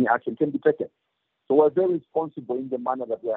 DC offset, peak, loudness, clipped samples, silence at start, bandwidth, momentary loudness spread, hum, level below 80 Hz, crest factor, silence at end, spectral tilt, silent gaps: under 0.1%; -4 dBFS; -24 LUFS; under 0.1%; 0 s; 4 kHz; 10 LU; none; -74 dBFS; 20 dB; 0 s; -10.5 dB/octave; none